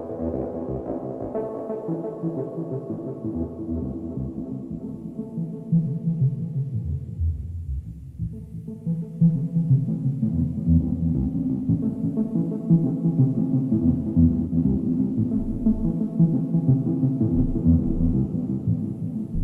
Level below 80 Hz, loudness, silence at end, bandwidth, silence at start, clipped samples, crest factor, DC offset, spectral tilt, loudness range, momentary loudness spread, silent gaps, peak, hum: -36 dBFS; -25 LUFS; 0 s; 1.8 kHz; 0 s; under 0.1%; 16 dB; under 0.1%; -13 dB/octave; 8 LU; 11 LU; none; -8 dBFS; none